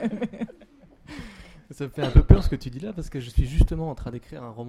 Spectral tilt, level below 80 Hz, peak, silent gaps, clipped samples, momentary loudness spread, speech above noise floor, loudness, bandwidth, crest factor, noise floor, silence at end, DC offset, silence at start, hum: -8 dB/octave; -26 dBFS; -2 dBFS; none; under 0.1%; 22 LU; 31 dB; -24 LUFS; 11.5 kHz; 22 dB; -52 dBFS; 0 s; under 0.1%; 0 s; none